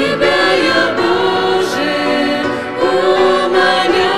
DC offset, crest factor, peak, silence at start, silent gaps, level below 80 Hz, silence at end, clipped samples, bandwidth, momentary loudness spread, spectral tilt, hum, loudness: 1%; 12 dB; 0 dBFS; 0 s; none; -48 dBFS; 0 s; under 0.1%; 13.5 kHz; 4 LU; -4 dB/octave; none; -13 LUFS